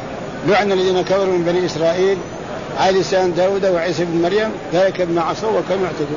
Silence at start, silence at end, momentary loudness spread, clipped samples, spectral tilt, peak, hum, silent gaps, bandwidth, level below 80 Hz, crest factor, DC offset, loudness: 0 s; 0 s; 5 LU; under 0.1%; -5.5 dB/octave; -4 dBFS; none; none; 7.4 kHz; -48 dBFS; 12 dB; 0.3%; -17 LUFS